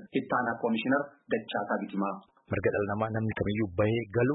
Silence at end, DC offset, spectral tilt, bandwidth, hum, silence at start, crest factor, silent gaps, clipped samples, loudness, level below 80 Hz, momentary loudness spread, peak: 0 s; under 0.1%; -11 dB/octave; 4 kHz; none; 0 s; 16 dB; none; under 0.1%; -30 LUFS; -58 dBFS; 6 LU; -14 dBFS